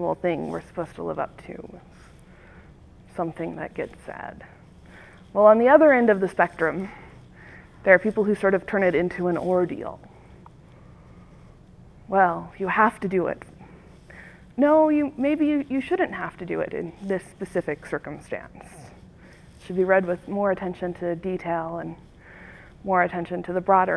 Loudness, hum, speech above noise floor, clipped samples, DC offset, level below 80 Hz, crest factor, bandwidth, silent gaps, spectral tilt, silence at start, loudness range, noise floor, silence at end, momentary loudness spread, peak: -23 LUFS; none; 26 dB; under 0.1%; under 0.1%; -54 dBFS; 22 dB; 11 kHz; none; -7.5 dB/octave; 0 s; 13 LU; -49 dBFS; 0 s; 19 LU; -2 dBFS